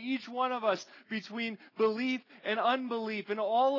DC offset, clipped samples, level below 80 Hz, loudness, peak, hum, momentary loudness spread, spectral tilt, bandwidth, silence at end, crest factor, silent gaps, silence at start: under 0.1%; under 0.1%; under -90 dBFS; -33 LUFS; -16 dBFS; none; 8 LU; -4.5 dB/octave; 6 kHz; 0 s; 16 dB; none; 0 s